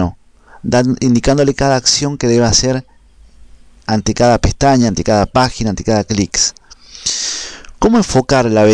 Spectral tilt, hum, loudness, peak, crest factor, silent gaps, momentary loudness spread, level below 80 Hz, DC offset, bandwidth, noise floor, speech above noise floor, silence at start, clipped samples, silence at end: -4.5 dB/octave; none; -13 LUFS; -2 dBFS; 10 dB; none; 8 LU; -30 dBFS; under 0.1%; 10.5 kHz; -43 dBFS; 30 dB; 0 s; under 0.1%; 0 s